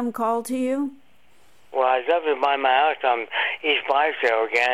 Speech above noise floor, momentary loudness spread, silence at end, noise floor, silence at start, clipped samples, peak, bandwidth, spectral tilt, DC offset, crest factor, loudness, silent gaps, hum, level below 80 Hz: 38 dB; 6 LU; 0 s; -60 dBFS; 0 s; under 0.1%; -6 dBFS; 15.5 kHz; -2.5 dB/octave; 0.3%; 16 dB; -22 LUFS; none; none; -74 dBFS